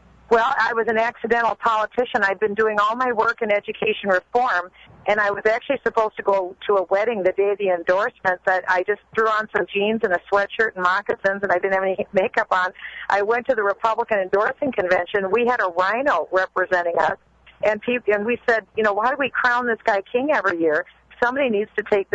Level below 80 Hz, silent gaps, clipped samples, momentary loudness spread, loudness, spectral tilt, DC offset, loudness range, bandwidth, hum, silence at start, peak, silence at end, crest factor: -58 dBFS; none; under 0.1%; 3 LU; -21 LUFS; -5 dB/octave; under 0.1%; 1 LU; 8 kHz; none; 0.3 s; -6 dBFS; 0.1 s; 14 dB